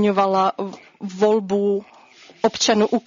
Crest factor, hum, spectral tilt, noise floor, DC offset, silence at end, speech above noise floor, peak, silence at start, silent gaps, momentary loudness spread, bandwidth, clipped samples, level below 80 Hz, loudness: 16 dB; none; -4.5 dB/octave; -48 dBFS; under 0.1%; 0.05 s; 29 dB; -4 dBFS; 0 s; none; 14 LU; 7.6 kHz; under 0.1%; -64 dBFS; -20 LUFS